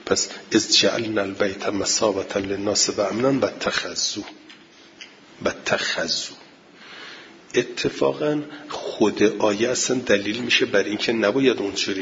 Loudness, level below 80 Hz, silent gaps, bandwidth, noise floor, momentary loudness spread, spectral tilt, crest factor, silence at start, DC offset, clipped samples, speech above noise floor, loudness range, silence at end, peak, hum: -22 LUFS; -60 dBFS; none; 7.8 kHz; -48 dBFS; 15 LU; -2.5 dB/octave; 20 dB; 0 s; under 0.1%; under 0.1%; 26 dB; 6 LU; 0 s; -4 dBFS; none